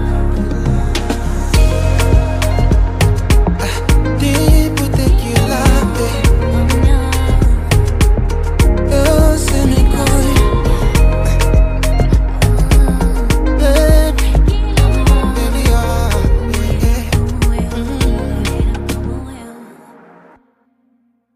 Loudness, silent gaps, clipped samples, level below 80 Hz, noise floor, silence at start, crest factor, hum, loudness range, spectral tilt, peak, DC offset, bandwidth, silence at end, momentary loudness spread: -14 LUFS; none; under 0.1%; -14 dBFS; -58 dBFS; 0 s; 12 dB; none; 4 LU; -6 dB/octave; 0 dBFS; under 0.1%; 16 kHz; 1.7 s; 6 LU